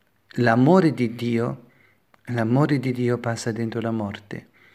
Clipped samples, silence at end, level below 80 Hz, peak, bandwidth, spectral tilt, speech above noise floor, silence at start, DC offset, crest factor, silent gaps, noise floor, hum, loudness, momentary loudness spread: under 0.1%; 0.35 s; -66 dBFS; -2 dBFS; 13.5 kHz; -7.5 dB/octave; 38 dB; 0.35 s; under 0.1%; 20 dB; none; -59 dBFS; none; -22 LUFS; 18 LU